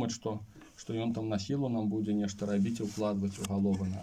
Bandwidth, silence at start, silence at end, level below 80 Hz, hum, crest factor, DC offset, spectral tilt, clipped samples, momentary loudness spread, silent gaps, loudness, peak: 12.5 kHz; 0 s; 0 s; -64 dBFS; none; 14 dB; under 0.1%; -6.5 dB/octave; under 0.1%; 8 LU; none; -33 LUFS; -20 dBFS